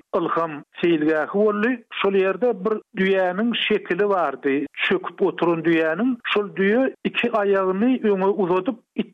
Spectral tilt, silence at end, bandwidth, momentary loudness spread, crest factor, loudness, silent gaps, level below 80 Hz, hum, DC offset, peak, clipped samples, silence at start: -7.5 dB/octave; 0.05 s; 5.8 kHz; 4 LU; 12 dB; -21 LUFS; none; -66 dBFS; none; under 0.1%; -10 dBFS; under 0.1%; 0.15 s